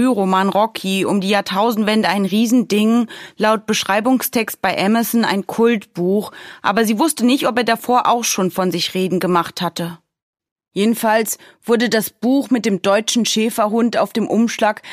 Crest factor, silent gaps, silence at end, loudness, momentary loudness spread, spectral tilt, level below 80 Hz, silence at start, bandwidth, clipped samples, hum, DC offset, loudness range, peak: 16 dB; 10.22-10.33 s, 10.52-10.56 s; 0 s; -17 LUFS; 4 LU; -4 dB/octave; -62 dBFS; 0 s; 15.5 kHz; under 0.1%; none; under 0.1%; 3 LU; 0 dBFS